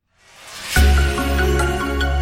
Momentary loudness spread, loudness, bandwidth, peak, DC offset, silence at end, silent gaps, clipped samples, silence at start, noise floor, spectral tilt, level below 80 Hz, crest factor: 10 LU; -18 LUFS; 16.5 kHz; -4 dBFS; under 0.1%; 0 s; none; under 0.1%; 0.4 s; -45 dBFS; -5 dB/octave; -20 dBFS; 14 dB